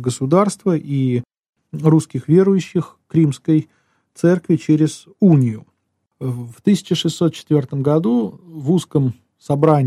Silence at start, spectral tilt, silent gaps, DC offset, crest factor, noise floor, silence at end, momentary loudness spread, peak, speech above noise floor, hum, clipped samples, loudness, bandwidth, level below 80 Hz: 0 s; -7.5 dB/octave; 1.49-1.53 s; under 0.1%; 16 dB; -70 dBFS; 0 s; 11 LU; -2 dBFS; 54 dB; none; under 0.1%; -18 LUFS; 12.5 kHz; -60 dBFS